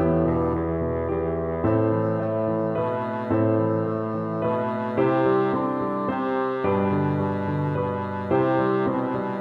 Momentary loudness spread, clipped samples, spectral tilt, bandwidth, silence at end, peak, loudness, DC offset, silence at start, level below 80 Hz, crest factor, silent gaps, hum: 5 LU; under 0.1%; -10.5 dB/octave; 5.2 kHz; 0 s; -10 dBFS; -24 LUFS; under 0.1%; 0 s; -50 dBFS; 12 dB; none; none